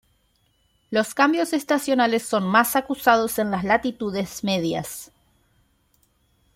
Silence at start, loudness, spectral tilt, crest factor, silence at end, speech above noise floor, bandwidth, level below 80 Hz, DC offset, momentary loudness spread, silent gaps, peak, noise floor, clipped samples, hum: 0.9 s; -22 LUFS; -4 dB/octave; 20 dB; 1.5 s; 44 dB; 16.5 kHz; -58 dBFS; under 0.1%; 8 LU; none; -2 dBFS; -66 dBFS; under 0.1%; none